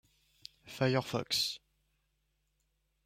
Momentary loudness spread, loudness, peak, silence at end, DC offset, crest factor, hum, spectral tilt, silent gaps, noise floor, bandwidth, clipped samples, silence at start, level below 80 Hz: 22 LU; -33 LUFS; -16 dBFS; 1.5 s; under 0.1%; 22 dB; none; -4 dB/octave; none; -79 dBFS; 16.5 kHz; under 0.1%; 0.65 s; -72 dBFS